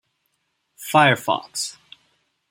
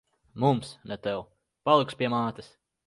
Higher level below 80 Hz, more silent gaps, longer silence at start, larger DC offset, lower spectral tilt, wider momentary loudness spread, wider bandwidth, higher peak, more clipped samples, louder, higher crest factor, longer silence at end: about the same, -68 dBFS vs -64 dBFS; neither; first, 0.8 s vs 0.35 s; neither; second, -3.5 dB/octave vs -6.5 dB/octave; about the same, 14 LU vs 15 LU; first, 16.5 kHz vs 11.5 kHz; first, -2 dBFS vs -6 dBFS; neither; first, -20 LUFS vs -28 LUFS; about the same, 22 dB vs 22 dB; first, 0.8 s vs 0.4 s